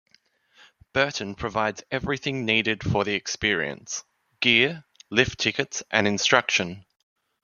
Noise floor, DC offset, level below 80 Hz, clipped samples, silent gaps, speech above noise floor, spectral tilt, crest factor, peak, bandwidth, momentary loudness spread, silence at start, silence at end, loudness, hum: -64 dBFS; under 0.1%; -54 dBFS; under 0.1%; none; 39 dB; -3 dB/octave; 24 dB; -2 dBFS; 7.4 kHz; 11 LU; 0.95 s; 0.65 s; -24 LUFS; none